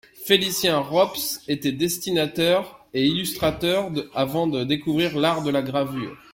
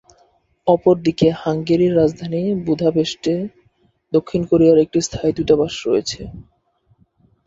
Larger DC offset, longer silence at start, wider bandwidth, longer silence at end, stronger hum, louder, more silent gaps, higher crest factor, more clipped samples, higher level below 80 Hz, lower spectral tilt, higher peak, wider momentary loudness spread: neither; second, 0.15 s vs 0.65 s; first, 16.5 kHz vs 7.8 kHz; second, 0.15 s vs 1.05 s; neither; second, -23 LUFS vs -18 LUFS; neither; first, 22 dB vs 16 dB; neither; second, -54 dBFS vs -48 dBFS; second, -4 dB/octave vs -6.5 dB/octave; about the same, -2 dBFS vs -2 dBFS; second, 5 LU vs 9 LU